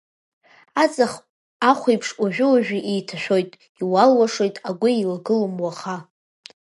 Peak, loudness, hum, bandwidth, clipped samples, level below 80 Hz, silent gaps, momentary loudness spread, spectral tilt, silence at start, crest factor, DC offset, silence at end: -2 dBFS; -20 LUFS; none; 11.5 kHz; under 0.1%; -72 dBFS; 1.29-1.60 s, 3.69-3.75 s; 12 LU; -5 dB/octave; 0.75 s; 20 dB; under 0.1%; 0.75 s